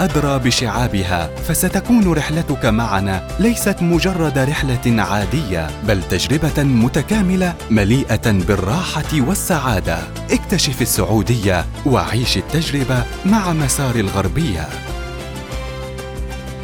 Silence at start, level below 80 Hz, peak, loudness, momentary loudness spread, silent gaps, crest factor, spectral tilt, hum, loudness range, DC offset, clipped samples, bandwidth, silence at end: 0 s; -28 dBFS; -2 dBFS; -17 LUFS; 10 LU; none; 14 dB; -5 dB/octave; none; 2 LU; under 0.1%; under 0.1%; 19 kHz; 0 s